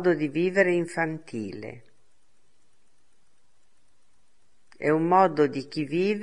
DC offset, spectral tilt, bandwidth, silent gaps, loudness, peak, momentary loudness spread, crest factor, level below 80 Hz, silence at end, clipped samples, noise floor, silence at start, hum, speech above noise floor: 0.3%; -7 dB/octave; 11 kHz; none; -25 LUFS; -6 dBFS; 15 LU; 22 dB; -70 dBFS; 0 s; under 0.1%; -71 dBFS; 0 s; none; 46 dB